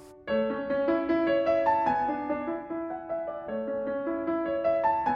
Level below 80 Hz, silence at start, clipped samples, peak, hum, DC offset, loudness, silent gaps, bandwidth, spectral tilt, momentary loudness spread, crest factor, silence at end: -60 dBFS; 0 s; under 0.1%; -14 dBFS; none; under 0.1%; -29 LUFS; none; 6.4 kHz; -7.5 dB/octave; 9 LU; 14 dB; 0 s